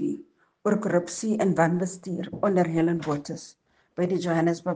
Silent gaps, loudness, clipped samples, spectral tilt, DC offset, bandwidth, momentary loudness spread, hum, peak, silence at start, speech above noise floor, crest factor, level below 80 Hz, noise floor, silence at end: none; -26 LUFS; under 0.1%; -6.5 dB/octave; under 0.1%; 9.6 kHz; 11 LU; none; -6 dBFS; 0 s; 21 dB; 20 dB; -64 dBFS; -46 dBFS; 0 s